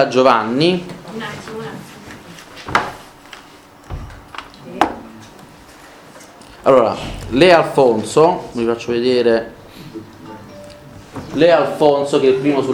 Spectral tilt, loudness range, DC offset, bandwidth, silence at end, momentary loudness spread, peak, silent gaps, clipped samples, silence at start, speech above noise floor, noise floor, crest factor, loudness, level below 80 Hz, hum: -5.5 dB/octave; 13 LU; under 0.1%; 16.5 kHz; 0 s; 23 LU; 0 dBFS; none; under 0.1%; 0 s; 28 dB; -42 dBFS; 18 dB; -15 LUFS; -44 dBFS; none